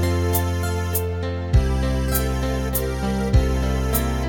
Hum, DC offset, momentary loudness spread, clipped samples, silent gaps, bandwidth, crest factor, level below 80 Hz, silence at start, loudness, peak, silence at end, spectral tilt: none; under 0.1%; 4 LU; under 0.1%; none; 19 kHz; 16 dB; -24 dBFS; 0 s; -22 LUFS; -6 dBFS; 0 s; -6 dB/octave